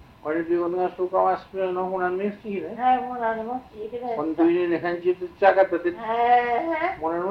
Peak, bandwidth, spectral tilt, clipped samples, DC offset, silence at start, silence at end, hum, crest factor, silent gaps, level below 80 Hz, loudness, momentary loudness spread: -4 dBFS; 5.6 kHz; -7.5 dB/octave; under 0.1%; under 0.1%; 0.25 s; 0 s; none; 18 dB; none; -60 dBFS; -24 LUFS; 10 LU